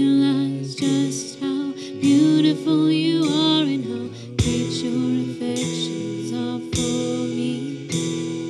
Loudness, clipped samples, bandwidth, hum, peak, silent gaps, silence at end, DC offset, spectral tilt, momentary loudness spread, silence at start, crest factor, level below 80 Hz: -22 LUFS; under 0.1%; 12 kHz; none; -6 dBFS; none; 0 s; under 0.1%; -5 dB/octave; 9 LU; 0 s; 14 dB; -46 dBFS